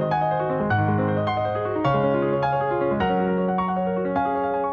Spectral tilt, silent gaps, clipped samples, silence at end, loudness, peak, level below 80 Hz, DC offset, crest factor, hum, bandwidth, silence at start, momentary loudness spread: -9.5 dB/octave; none; under 0.1%; 0 s; -23 LUFS; -10 dBFS; -50 dBFS; under 0.1%; 12 dB; none; 6.4 kHz; 0 s; 3 LU